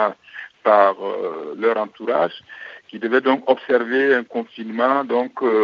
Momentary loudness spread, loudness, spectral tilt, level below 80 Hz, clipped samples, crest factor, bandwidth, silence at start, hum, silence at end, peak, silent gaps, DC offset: 18 LU; -20 LUFS; -6.5 dB/octave; -80 dBFS; under 0.1%; 20 dB; 6.8 kHz; 0 s; none; 0 s; 0 dBFS; none; under 0.1%